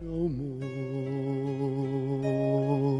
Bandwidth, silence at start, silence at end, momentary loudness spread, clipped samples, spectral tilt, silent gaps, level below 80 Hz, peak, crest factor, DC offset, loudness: 9.8 kHz; 0 s; 0 s; 7 LU; under 0.1%; -9.5 dB/octave; none; -52 dBFS; -16 dBFS; 12 dB; under 0.1%; -30 LUFS